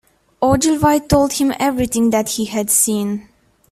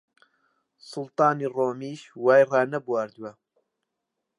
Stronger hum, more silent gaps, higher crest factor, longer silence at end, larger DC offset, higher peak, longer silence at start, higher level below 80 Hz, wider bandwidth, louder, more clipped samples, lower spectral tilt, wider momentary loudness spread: neither; neither; about the same, 16 dB vs 20 dB; second, 0.5 s vs 1.05 s; neither; first, 0 dBFS vs -8 dBFS; second, 0.4 s vs 0.85 s; first, -40 dBFS vs -82 dBFS; first, 16 kHz vs 11 kHz; first, -16 LUFS vs -24 LUFS; neither; second, -4 dB/octave vs -6.5 dB/octave; second, 6 LU vs 19 LU